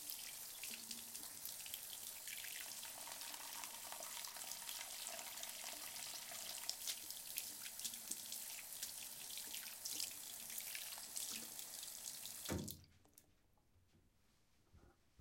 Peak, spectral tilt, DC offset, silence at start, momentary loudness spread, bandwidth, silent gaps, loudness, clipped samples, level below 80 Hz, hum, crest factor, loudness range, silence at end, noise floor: -20 dBFS; -0.5 dB/octave; under 0.1%; 0 s; 3 LU; 17 kHz; none; -47 LUFS; under 0.1%; -78 dBFS; none; 30 dB; 3 LU; 0 s; -77 dBFS